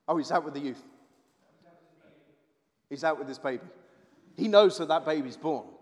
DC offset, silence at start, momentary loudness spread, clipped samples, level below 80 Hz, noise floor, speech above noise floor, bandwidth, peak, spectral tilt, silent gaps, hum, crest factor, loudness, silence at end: under 0.1%; 0.1 s; 19 LU; under 0.1%; under -90 dBFS; -73 dBFS; 46 dB; 11 kHz; -6 dBFS; -5 dB/octave; none; none; 24 dB; -28 LUFS; 0.15 s